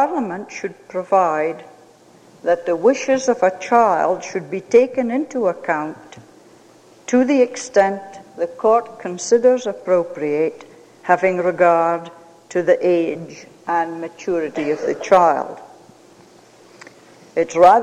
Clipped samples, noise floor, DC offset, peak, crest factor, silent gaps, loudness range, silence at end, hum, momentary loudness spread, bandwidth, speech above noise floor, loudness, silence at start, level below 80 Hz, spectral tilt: under 0.1%; -48 dBFS; under 0.1%; -2 dBFS; 18 dB; none; 3 LU; 0 s; none; 15 LU; 9.8 kHz; 31 dB; -18 LUFS; 0 s; -64 dBFS; -5 dB/octave